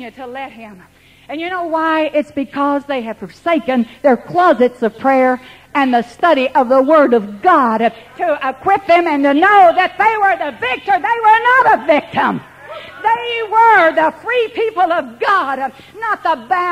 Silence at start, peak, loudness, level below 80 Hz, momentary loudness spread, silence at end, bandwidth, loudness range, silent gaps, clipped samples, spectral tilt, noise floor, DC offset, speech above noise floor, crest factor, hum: 0 s; 0 dBFS; -14 LUFS; -56 dBFS; 13 LU; 0 s; 15 kHz; 5 LU; none; under 0.1%; -5.5 dB/octave; -33 dBFS; under 0.1%; 19 dB; 14 dB; none